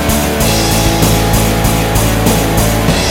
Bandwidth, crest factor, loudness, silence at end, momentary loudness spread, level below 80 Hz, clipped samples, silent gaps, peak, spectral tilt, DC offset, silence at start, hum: 17 kHz; 10 dB; -11 LUFS; 0 s; 1 LU; -18 dBFS; under 0.1%; none; 0 dBFS; -4.5 dB/octave; under 0.1%; 0 s; none